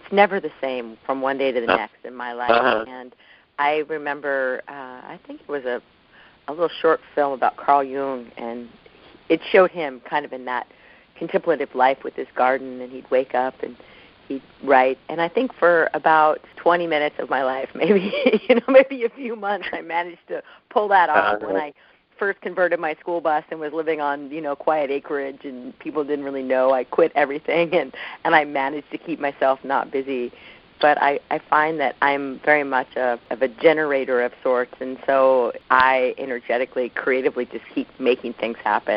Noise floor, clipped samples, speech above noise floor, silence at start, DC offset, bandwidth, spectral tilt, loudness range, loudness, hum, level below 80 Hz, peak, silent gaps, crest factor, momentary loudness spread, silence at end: -52 dBFS; under 0.1%; 31 dB; 0.05 s; under 0.1%; 5.4 kHz; -2 dB/octave; 5 LU; -21 LUFS; none; -64 dBFS; 0 dBFS; none; 22 dB; 14 LU; 0 s